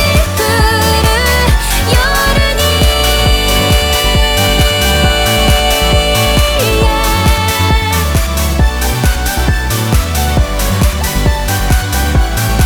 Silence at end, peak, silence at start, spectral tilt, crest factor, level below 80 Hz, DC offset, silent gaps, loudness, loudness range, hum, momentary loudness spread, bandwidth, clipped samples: 0 s; 0 dBFS; 0 s; -4 dB/octave; 10 dB; -14 dBFS; under 0.1%; none; -11 LUFS; 3 LU; none; 4 LU; over 20 kHz; under 0.1%